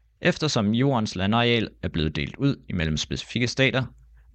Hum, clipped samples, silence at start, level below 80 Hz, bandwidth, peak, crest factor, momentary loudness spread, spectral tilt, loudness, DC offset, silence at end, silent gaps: none; under 0.1%; 0.2 s; -46 dBFS; 8.8 kHz; -8 dBFS; 18 dB; 7 LU; -5.5 dB/octave; -24 LUFS; under 0.1%; 0.45 s; none